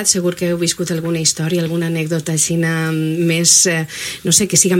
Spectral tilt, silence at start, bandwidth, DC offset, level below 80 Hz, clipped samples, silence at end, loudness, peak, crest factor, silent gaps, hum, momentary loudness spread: -3 dB/octave; 0 s; 16.5 kHz; under 0.1%; -52 dBFS; under 0.1%; 0 s; -15 LUFS; 0 dBFS; 16 dB; none; none; 9 LU